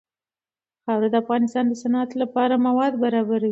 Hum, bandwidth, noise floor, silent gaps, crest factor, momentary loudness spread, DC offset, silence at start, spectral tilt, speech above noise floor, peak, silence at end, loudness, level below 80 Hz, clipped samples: none; 7.8 kHz; under -90 dBFS; none; 14 dB; 4 LU; under 0.1%; 0.85 s; -6.5 dB/octave; over 69 dB; -8 dBFS; 0 s; -22 LUFS; -72 dBFS; under 0.1%